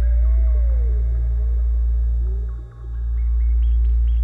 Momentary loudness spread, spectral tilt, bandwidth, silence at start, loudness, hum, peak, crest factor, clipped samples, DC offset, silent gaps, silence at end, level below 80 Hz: 9 LU; -10 dB/octave; 1.8 kHz; 0 s; -21 LUFS; none; -12 dBFS; 6 dB; under 0.1%; under 0.1%; none; 0 s; -18 dBFS